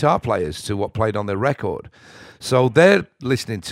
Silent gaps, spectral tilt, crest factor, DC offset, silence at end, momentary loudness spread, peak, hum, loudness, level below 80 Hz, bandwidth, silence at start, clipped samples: none; -6 dB/octave; 18 dB; under 0.1%; 0 s; 12 LU; 0 dBFS; none; -19 LUFS; -48 dBFS; 15.5 kHz; 0 s; under 0.1%